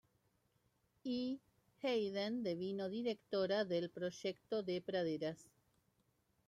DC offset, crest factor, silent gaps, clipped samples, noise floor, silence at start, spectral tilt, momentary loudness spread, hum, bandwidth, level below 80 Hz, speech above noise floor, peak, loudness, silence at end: under 0.1%; 16 dB; none; under 0.1%; -80 dBFS; 1.05 s; -6 dB/octave; 7 LU; none; 13 kHz; -82 dBFS; 39 dB; -26 dBFS; -41 LUFS; 1.05 s